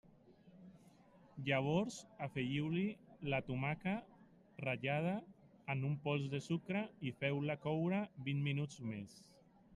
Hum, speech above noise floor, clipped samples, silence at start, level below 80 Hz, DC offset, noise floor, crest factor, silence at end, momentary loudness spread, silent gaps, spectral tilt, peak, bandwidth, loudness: none; 26 dB; under 0.1%; 0.3 s; -72 dBFS; under 0.1%; -65 dBFS; 18 dB; 0 s; 10 LU; none; -6.5 dB/octave; -22 dBFS; 11 kHz; -40 LUFS